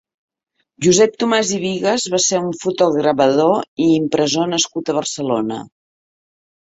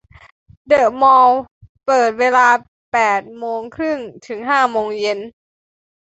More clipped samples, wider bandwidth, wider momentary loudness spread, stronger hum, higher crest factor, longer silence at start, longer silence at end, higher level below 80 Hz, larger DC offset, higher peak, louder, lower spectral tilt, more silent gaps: neither; about the same, 8.2 kHz vs 8.2 kHz; second, 7 LU vs 15 LU; neither; about the same, 16 dB vs 16 dB; about the same, 0.8 s vs 0.7 s; first, 0.95 s vs 0.8 s; about the same, -58 dBFS vs -56 dBFS; neither; about the same, -2 dBFS vs -2 dBFS; about the same, -17 LUFS vs -15 LUFS; about the same, -3.5 dB/octave vs -3.5 dB/octave; second, 3.68-3.77 s vs 1.51-1.61 s, 1.69-1.75 s, 2.68-2.92 s